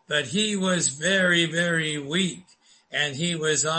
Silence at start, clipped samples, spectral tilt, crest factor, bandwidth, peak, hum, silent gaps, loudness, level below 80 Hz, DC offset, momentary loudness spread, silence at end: 0.1 s; under 0.1%; -3 dB/octave; 16 dB; 8.8 kHz; -8 dBFS; none; none; -23 LUFS; -68 dBFS; under 0.1%; 6 LU; 0 s